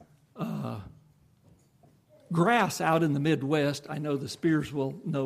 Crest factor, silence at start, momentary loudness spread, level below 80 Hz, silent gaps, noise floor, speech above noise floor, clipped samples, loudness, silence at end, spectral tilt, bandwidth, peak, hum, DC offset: 18 dB; 0.35 s; 12 LU; -66 dBFS; none; -62 dBFS; 35 dB; under 0.1%; -28 LUFS; 0 s; -6 dB/octave; 15.5 kHz; -12 dBFS; none; under 0.1%